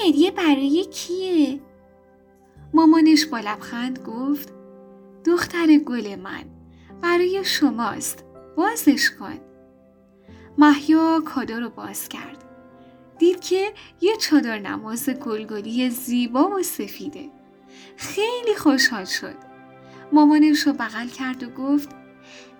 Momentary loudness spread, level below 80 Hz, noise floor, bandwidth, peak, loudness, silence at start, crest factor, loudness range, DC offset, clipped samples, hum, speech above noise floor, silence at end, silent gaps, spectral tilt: 16 LU; -64 dBFS; -53 dBFS; over 20 kHz; -2 dBFS; -21 LUFS; 0 s; 20 dB; 4 LU; under 0.1%; under 0.1%; none; 33 dB; 0.15 s; none; -3 dB/octave